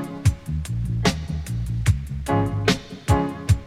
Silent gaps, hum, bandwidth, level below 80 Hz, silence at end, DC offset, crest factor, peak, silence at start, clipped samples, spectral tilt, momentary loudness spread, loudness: none; none; 15.5 kHz; -32 dBFS; 0 s; under 0.1%; 18 dB; -6 dBFS; 0 s; under 0.1%; -6 dB/octave; 6 LU; -24 LUFS